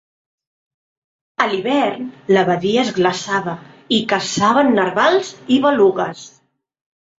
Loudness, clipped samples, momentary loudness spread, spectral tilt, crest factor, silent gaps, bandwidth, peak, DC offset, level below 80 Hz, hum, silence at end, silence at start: -16 LUFS; under 0.1%; 11 LU; -4.5 dB/octave; 16 dB; none; 8 kHz; -2 dBFS; under 0.1%; -60 dBFS; none; 0.9 s; 1.4 s